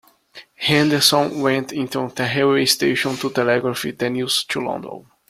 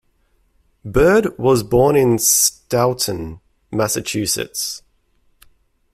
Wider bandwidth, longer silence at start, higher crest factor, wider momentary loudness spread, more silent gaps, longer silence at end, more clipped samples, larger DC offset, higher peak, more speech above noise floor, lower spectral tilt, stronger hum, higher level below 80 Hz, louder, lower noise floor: about the same, 16 kHz vs 16 kHz; second, 0.35 s vs 0.85 s; about the same, 20 dB vs 18 dB; second, 10 LU vs 14 LU; neither; second, 0.3 s vs 1.15 s; neither; neither; about the same, 0 dBFS vs 0 dBFS; second, 26 dB vs 44 dB; about the same, -3.5 dB/octave vs -3.5 dB/octave; neither; second, -60 dBFS vs -40 dBFS; second, -19 LUFS vs -16 LUFS; second, -46 dBFS vs -61 dBFS